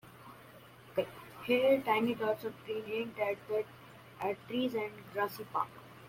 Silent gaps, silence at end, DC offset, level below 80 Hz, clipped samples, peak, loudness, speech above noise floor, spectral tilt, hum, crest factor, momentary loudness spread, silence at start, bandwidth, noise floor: none; 0 s; under 0.1%; -74 dBFS; under 0.1%; -18 dBFS; -35 LUFS; 22 dB; -5.5 dB/octave; none; 18 dB; 24 LU; 0.05 s; 16.5 kHz; -55 dBFS